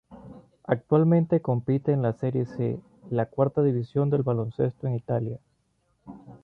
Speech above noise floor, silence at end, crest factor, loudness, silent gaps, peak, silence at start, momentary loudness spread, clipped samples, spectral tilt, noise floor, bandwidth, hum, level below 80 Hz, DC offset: 46 dB; 0.1 s; 18 dB; -26 LUFS; none; -8 dBFS; 0.1 s; 10 LU; under 0.1%; -11.5 dB/octave; -71 dBFS; 4.6 kHz; none; -60 dBFS; under 0.1%